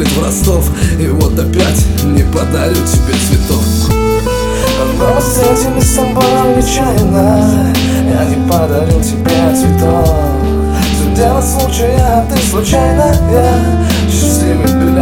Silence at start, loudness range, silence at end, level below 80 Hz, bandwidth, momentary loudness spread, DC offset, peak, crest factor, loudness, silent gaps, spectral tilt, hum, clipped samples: 0 s; 1 LU; 0 s; -16 dBFS; 18.5 kHz; 3 LU; under 0.1%; 0 dBFS; 10 dB; -11 LUFS; none; -5.5 dB/octave; none; 0.3%